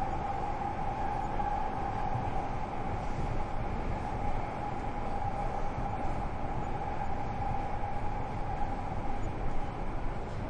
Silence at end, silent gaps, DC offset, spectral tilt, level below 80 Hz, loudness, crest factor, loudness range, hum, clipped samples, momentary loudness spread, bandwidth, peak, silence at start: 0 s; none; under 0.1%; -7.5 dB/octave; -38 dBFS; -36 LUFS; 14 dB; 2 LU; none; under 0.1%; 3 LU; 8.6 kHz; -18 dBFS; 0 s